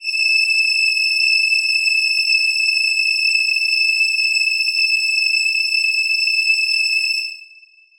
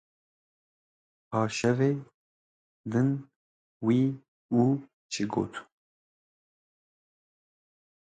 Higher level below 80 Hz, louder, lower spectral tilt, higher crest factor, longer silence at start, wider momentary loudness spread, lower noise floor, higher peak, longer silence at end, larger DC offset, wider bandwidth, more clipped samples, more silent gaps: about the same, -66 dBFS vs -68 dBFS; first, -14 LUFS vs -29 LUFS; second, 7.5 dB/octave vs -6.5 dB/octave; second, 12 dB vs 20 dB; second, 0 s vs 1.3 s; second, 2 LU vs 11 LU; second, -48 dBFS vs under -90 dBFS; first, -6 dBFS vs -12 dBFS; second, 0.55 s vs 2.5 s; neither; first, over 20 kHz vs 9.2 kHz; neither; second, none vs 2.14-2.84 s, 3.36-3.80 s, 4.28-4.49 s, 4.93-5.09 s